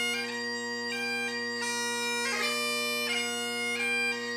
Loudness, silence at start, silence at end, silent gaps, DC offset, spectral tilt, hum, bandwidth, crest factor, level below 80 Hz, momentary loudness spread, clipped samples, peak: -29 LUFS; 0 s; 0 s; none; under 0.1%; -0.5 dB/octave; none; 15.5 kHz; 14 dB; -86 dBFS; 5 LU; under 0.1%; -18 dBFS